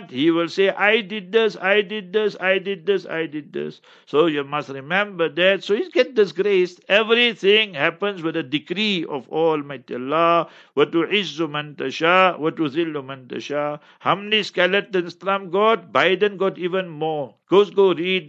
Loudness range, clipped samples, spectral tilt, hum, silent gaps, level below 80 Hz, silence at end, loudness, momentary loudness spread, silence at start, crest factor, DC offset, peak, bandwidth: 4 LU; under 0.1%; -5.5 dB/octave; none; none; -76 dBFS; 0 s; -20 LUFS; 10 LU; 0 s; 20 dB; under 0.1%; -2 dBFS; 7.8 kHz